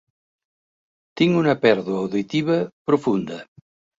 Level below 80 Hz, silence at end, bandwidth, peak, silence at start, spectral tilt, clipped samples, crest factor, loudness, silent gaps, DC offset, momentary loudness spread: -62 dBFS; 0.55 s; 7.8 kHz; -2 dBFS; 1.15 s; -7 dB/octave; under 0.1%; 20 dB; -21 LUFS; 2.73-2.85 s; under 0.1%; 8 LU